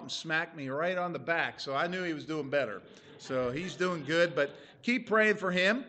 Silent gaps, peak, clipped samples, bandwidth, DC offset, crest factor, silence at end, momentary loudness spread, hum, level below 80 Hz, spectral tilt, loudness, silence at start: none; -14 dBFS; under 0.1%; 8.8 kHz; under 0.1%; 18 dB; 0 s; 10 LU; none; -72 dBFS; -5 dB/octave; -31 LUFS; 0 s